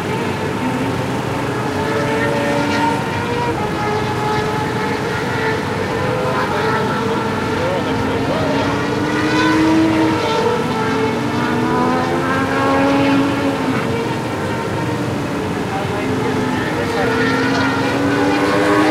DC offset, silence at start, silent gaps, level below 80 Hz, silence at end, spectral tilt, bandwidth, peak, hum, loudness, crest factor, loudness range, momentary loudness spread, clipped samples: under 0.1%; 0 s; none; -42 dBFS; 0 s; -5.5 dB/octave; 16 kHz; -4 dBFS; none; -17 LUFS; 14 dB; 3 LU; 6 LU; under 0.1%